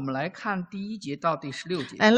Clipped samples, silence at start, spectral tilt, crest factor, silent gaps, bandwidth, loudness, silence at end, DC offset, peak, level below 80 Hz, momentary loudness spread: under 0.1%; 0 s; -5.5 dB/octave; 20 dB; none; 9.4 kHz; -30 LUFS; 0 s; under 0.1%; -6 dBFS; -68 dBFS; 7 LU